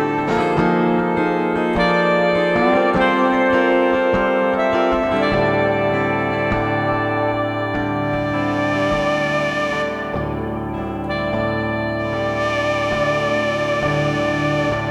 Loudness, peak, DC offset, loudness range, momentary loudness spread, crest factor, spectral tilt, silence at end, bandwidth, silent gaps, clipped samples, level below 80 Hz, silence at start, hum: -18 LUFS; -4 dBFS; under 0.1%; 5 LU; 6 LU; 14 dB; -6.5 dB/octave; 0 s; 12 kHz; none; under 0.1%; -40 dBFS; 0 s; none